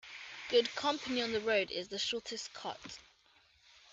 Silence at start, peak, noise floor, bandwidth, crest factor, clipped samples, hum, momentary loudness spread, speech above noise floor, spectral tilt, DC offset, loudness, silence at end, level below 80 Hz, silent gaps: 0.05 s; -16 dBFS; -68 dBFS; 8.4 kHz; 22 dB; under 0.1%; none; 15 LU; 32 dB; -2.5 dB/octave; under 0.1%; -35 LUFS; 0 s; -74 dBFS; none